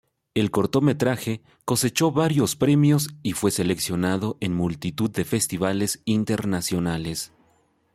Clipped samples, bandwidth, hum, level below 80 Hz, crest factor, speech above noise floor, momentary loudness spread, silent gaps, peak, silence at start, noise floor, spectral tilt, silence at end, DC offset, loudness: under 0.1%; 16 kHz; none; -54 dBFS; 18 dB; 41 dB; 8 LU; none; -6 dBFS; 0.35 s; -64 dBFS; -5 dB/octave; 0.7 s; under 0.1%; -23 LUFS